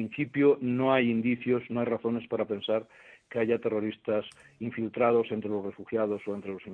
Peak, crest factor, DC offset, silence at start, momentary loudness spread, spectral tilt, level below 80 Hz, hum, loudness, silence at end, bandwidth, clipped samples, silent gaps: -12 dBFS; 18 dB; under 0.1%; 0 s; 10 LU; -8.5 dB/octave; -70 dBFS; none; -29 LUFS; 0 s; 9.4 kHz; under 0.1%; none